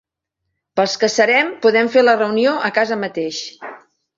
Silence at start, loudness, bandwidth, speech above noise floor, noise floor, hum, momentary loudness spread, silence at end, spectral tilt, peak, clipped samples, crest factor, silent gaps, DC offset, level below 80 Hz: 0.75 s; -16 LUFS; 7.8 kHz; 61 dB; -77 dBFS; none; 13 LU; 0.4 s; -3.5 dB/octave; -2 dBFS; under 0.1%; 16 dB; none; under 0.1%; -66 dBFS